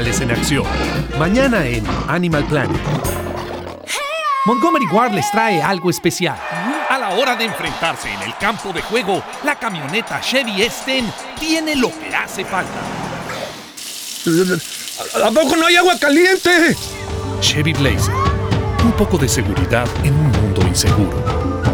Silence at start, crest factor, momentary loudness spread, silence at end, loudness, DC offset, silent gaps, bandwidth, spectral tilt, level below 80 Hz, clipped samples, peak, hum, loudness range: 0 s; 16 dB; 11 LU; 0 s; -17 LUFS; under 0.1%; none; over 20 kHz; -4.5 dB/octave; -32 dBFS; under 0.1%; -2 dBFS; none; 6 LU